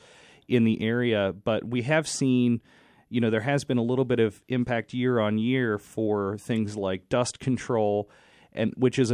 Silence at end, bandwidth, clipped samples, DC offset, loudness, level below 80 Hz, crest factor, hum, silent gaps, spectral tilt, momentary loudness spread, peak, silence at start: 0 s; 11.5 kHz; under 0.1%; under 0.1%; -26 LUFS; -58 dBFS; 16 dB; none; none; -6 dB/octave; 6 LU; -10 dBFS; 0.5 s